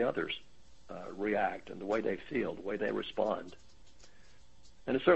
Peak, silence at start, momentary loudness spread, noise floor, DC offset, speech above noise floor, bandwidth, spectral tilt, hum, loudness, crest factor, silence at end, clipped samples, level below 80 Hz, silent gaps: -12 dBFS; 0 s; 13 LU; -61 dBFS; 0.3%; 28 dB; 8.2 kHz; -6 dB/octave; none; -36 LUFS; 24 dB; 0 s; under 0.1%; -64 dBFS; none